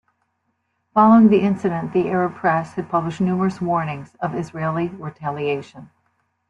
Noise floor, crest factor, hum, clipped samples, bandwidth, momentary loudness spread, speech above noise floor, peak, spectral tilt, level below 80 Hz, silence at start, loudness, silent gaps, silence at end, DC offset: -71 dBFS; 18 dB; none; under 0.1%; 8 kHz; 15 LU; 52 dB; -2 dBFS; -8.5 dB/octave; -60 dBFS; 0.95 s; -20 LUFS; none; 0.65 s; under 0.1%